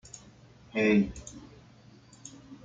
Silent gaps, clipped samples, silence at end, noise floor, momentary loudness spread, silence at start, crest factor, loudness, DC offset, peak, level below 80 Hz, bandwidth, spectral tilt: none; under 0.1%; 0.1 s; -55 dBFS; 24 LU; 0.15 s; 20 dB; -27 LUFS; under 0.1%; -14 dBFS; -56 dBFS; 9 kHz; -6 dB/octave